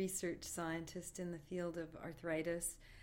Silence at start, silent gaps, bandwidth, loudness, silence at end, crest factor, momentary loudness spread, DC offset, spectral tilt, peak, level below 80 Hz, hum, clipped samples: 0 s; none; 17 kHz; -44 LUFS; 0 s; 16 dB; 7 LU; under 0.1%; -4.5 dB/octave; -28 dBFS; -64 dBFS; none; under 0.1%